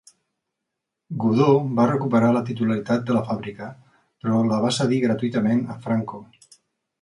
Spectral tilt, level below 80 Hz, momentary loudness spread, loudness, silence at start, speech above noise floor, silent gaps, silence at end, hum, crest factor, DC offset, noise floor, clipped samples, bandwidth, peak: -7 dB/octave; -62 dBFS; 16 LU; -22 LUFS; 1.1 s; 61 dB; none; 0.8 s; none; 18 dB; under 0.1%; -82 dBFS; under 0.1%; 11 kHz; -4 dBFS